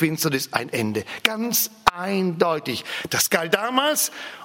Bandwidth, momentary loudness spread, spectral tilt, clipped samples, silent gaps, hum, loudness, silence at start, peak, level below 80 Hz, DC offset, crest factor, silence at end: 16.5 kHz; 6 LU; -3 dB/octave; under 0.1%; none; none; -22 LUFS; 0 s; 0 dBFS; -56 dBFS; under 0.1%; 24 dB; 0 s